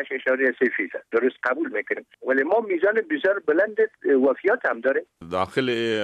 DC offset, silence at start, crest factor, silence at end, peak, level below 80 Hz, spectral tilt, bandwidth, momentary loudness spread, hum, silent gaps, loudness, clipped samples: under 0.1%; 0 s; 14 dB; 0 s; -8 dBFS; -68 dBFS; -6 dB/octave; 10 kHz; 7 LU; none; none; -23 LUFS; under 0.1%